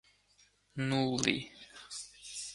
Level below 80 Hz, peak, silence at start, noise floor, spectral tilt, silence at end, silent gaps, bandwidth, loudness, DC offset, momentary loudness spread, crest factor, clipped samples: -68 dBFS; -12 dBFS; 0.75 s; -68 dBFS; -4 dB/octave; 0 s; none; 11.5 kHz; -35 LUFS; under 0.1%; 17 LU; 26 dB; under 0.1%